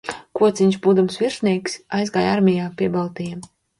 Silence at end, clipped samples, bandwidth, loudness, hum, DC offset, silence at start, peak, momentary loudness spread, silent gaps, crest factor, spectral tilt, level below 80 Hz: 0.35 s; under 0.1%; 11.5 kHz; -20 LUFS; none; under 0.1%; 0.05 s; -6 dBFS; 12 LU; none; 14 dB; -6 dB/octave; -58 dBFS